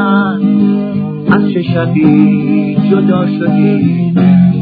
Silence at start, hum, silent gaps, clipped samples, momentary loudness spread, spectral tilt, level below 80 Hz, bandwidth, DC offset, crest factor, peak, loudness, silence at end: 0 s; none; none; 0.4%; 5 LU; -11.5 dB/octave; -46 dBFS; 4.9 kHz; under 0.1%; 10 dB; 0 dBFS; -10 LUFS; 0 s